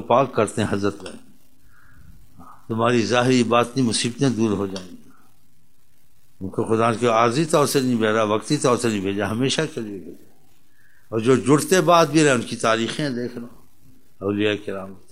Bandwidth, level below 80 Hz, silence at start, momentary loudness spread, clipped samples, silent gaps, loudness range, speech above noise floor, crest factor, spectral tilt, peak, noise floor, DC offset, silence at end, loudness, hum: 16 kHz; -60 dBFS; 0 s; 15 LU; under 0.1%; none; 4 LU; 42 dB; 20 dB; -5 dB/octave; -2 dBFS; -62 dBFS; 0.8%; 0.15 s; -20 LUFS; none